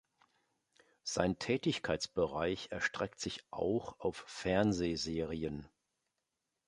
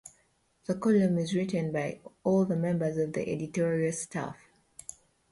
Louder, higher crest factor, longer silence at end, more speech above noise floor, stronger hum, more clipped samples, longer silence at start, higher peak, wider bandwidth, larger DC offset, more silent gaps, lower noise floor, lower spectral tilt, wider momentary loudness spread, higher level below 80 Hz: second, -36 LUFS vs -30 LUFS; first, 24 dB vs 16 dB; about the same, 1 s vs 0.95 s; first, 51 dB vs 41 dB; neither; neither; first, 1.05 s vs 0.05 s; about the same, -14 dBFS vs -14 dBFS; about the same, 11.5 kHz vs 11.5 kHz; neither; neither; first, -87 dBFS vs -70 dBFS; second, -4.5 dB/octave vs -6.5 dB/octave; second, 8 LU vs 17 LU; first, -58 dBFS vs -66 dBFS